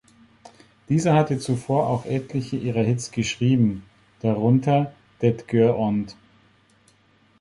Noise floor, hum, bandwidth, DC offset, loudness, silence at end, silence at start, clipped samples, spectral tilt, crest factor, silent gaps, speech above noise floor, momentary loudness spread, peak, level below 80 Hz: -59 dBFS; none; 11.5 kHz; under 0.1%; -22 LUFS; 1.3 s; 0.9 s; under 0.1%; -7 dB/octave; 18 dB; none; 38 dB; 8 LU; -6 dBFS; -54 dBFS